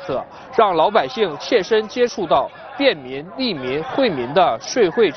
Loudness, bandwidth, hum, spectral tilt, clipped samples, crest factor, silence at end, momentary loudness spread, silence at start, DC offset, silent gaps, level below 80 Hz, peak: -19 LUFS; 6.6 kHz; none; -4.5 dB/octave; under 0.1%; 16 dB; 0 s; 8 LU; 0 s; under 0.1%; none; -56 dBFS; -2 dBFS